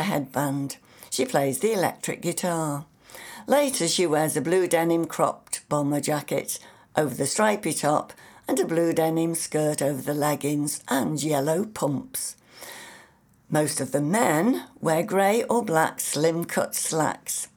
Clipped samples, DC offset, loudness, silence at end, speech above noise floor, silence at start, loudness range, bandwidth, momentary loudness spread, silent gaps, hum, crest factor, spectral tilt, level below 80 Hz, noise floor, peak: under 0.1%; under 0.1%; -25 LUFS; 0.1 s; 32 dB; 0 s; 4 LU; over 20 kHz; 11 LU; none; none; 20 dB; -4.5 dB/octave; -68 dBFS; -57 dBFS; -6 dBFS